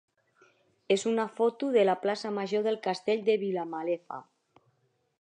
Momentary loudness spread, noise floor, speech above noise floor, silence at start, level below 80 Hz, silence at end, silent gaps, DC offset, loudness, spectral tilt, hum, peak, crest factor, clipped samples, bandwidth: 8 LU; -72 dBFS; 44 dB; 0.9 s; -86 dBFS; 1 s; none; under 0.1%; -29 LUFS; -5 dB/octave; none; -14 dBFS; 18 dB; under 0.1%; 10 kHz